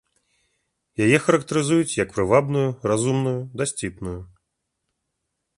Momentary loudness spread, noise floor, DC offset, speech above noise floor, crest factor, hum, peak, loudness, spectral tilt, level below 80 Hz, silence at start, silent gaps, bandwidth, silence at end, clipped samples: 13 LU; -78 dBFS; under 0.1%; 57 dB; 20 dB; none; -2 dBFS; -21 LUFS; -5.5 dB/octave; -50 dBFS; 1 s; none; 11.5 kHz; 1.35 s; under 0.1%